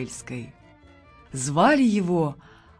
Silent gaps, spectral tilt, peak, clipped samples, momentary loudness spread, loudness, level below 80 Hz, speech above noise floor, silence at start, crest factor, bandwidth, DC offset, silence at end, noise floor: none; -5.5 dB/octave; -6 dBFS; under 0.1%; 19 LU; -22 LUFS; -56 dBFS; 29 dB; 0 s; 18 dB; 11 kHz; under 0.1%; 0.45 s; -52 dBFS